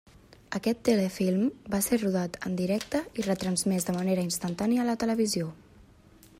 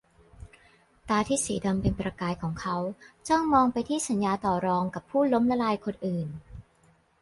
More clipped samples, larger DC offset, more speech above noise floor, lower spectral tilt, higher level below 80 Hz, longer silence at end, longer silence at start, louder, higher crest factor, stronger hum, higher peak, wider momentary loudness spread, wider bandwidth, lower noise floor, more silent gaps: neither; neither; second, 28 dB vs 36 dB; about the same, -5 dB/octave vs -5.5 dB/octave; second, -58 dBFS vs -50 dBFS; first, 0.85 s vs 0.6 s; about the same, 0.5 s vs 0.4 s; about the same, -28 LUFS vs -27 LUFS; about the same, 18 dB vs 18 dB; neither; about the same, -12 dBFS vs -10 dBFS; second, 6 LU vs 9 LU; first, 16 kHz vs 11.5 kHz; second, -56 dBFS vs -63 dBFS; neither